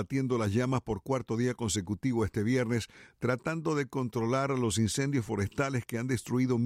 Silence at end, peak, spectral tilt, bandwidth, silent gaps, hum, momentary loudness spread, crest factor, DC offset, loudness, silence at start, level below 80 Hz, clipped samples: 0 s; -16 dBFS; -5.5 dB/octave; 15.5 kHz; none; none; 4 LU; 16 dB; under 0.1%; -31 LUFS; 0 s; -56 dBFS; under 0.1%